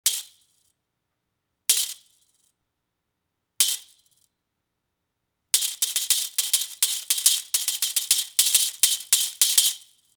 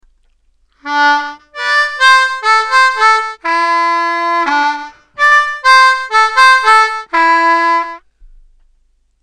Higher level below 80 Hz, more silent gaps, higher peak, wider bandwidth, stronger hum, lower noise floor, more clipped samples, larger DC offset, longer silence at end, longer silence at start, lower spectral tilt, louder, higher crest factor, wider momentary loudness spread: second, -84 dBFS vs -50 dBFS; neither; about the same, 0 dBFS vs 0 dBFS; first, over 20 kHz vs 12.5 kHz; neither; first, -80 dBFS vs -55 dBFS; neither; neither; second, 0.4 s vs 1.25 s; second, 0.05 s vs 0.85 s; second, 6 dB/octave vs 0.5 dB/octave; second, -21 LUFS vs -10 LUFS; first, 26 dB vs 12 dB; second, 7 LU vs 10 LU